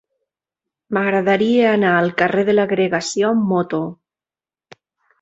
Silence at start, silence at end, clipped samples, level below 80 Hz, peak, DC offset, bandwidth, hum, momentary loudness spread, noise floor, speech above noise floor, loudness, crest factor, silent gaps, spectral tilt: 0.9 s; 1.25 s; under 0.1%; -62 dBFS; -2 dBFS; under 0.1%; 8.2 kHz; none; 8 LU; under -90 dBFS; over 74 dB; -17 LUFS; 16 dB; none; -5.5 dB/octave